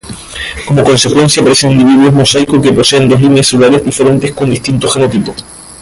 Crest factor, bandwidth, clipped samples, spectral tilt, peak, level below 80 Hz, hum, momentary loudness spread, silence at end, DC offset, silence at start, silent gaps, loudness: 8 dB; 11.5 kHz; under 0.1%; -5 dB/octave; 0 dBFS; -36 dBFS; none; 12 LU; 0 s; under 0.1%; 0.05 s; none; -8 LUFS